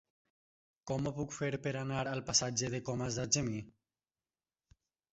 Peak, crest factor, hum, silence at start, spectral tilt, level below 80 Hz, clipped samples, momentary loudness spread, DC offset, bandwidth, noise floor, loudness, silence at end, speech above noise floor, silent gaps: -16 dBFS; 24 dB; none; 0.85 s; -4.5 dB/octave; -64 dBFS; under 0.1%; 9 LU; under 0.1%; 8 kHz; under -90 dBFS; -35 LUFS; 1.45 s; over 54 dB; none